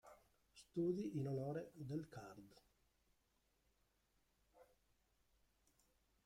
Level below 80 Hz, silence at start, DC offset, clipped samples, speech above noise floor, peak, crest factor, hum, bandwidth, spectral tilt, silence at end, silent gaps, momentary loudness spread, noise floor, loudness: -80 dBFS; 0.05 s; under 0.1%; under 0.1%; 37 dB; -32 dBFS; 20 dB; none; 16 kHz; -8 dB/octave; 1.65 s; none; 20 LU; -83 dBFS; -46 LUFS